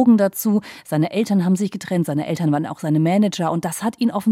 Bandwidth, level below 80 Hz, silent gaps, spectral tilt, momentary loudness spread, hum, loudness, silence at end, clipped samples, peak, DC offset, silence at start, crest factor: 16 kHz; -68 dBFS; none; -6.5 dB/octave; 6 LU; none; -20 LUFS; 0 s; under 0.1%; -4 dBFS; under 0.1%; 0 s; 14 dB